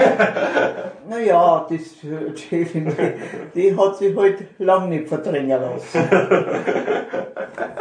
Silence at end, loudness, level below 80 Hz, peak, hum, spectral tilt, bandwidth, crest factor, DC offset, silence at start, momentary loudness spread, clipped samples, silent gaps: 0 s; -19 LUFS; -68 dBFS; -2 dBFS; none; -6.5 dB/octave; 9.8 kHz; 18 dB; under 0.1%; 0 s; 13 LU; under 0.1%; none